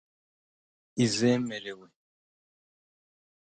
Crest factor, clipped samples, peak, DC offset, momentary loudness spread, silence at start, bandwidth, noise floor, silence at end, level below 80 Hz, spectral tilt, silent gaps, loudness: 20 dB; under 0.1%; -12 dBFS; under 0.1%; 17 LU; 0.95 s; 9.4 kHz; under -90 dBFS; 1.65 s; -72 dBFS; -5 dB/octave; none; -28 LUFS